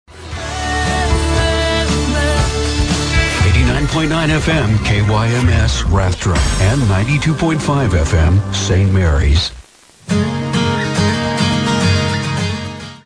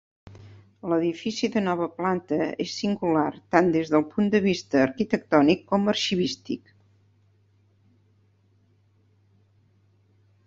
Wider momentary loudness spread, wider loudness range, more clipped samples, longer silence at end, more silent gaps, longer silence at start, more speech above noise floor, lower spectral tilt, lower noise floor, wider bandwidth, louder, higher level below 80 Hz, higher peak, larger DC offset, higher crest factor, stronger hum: about the same, 5 LU vs 7 LU; second, 2 LU vs 9 LU; neither; second, 0.1 s vs 3.9 s; neither; second, 0.1 s vs 0.25 s; second, 28 dB vs 39 dB; about the same, -5 dB/octave vs -5.5 dB/octave; second, -41 dBFS vs -63 dBFS; first, 10.5 kHz vs 7.8 kHz; first, -15 LUFS vs -24 LUFS; first, -22 dBFS vs -62 dBFS; about the same, -2 dBFS vs -4 dBFS; neither; second, 12 dB vs 22 dB; neither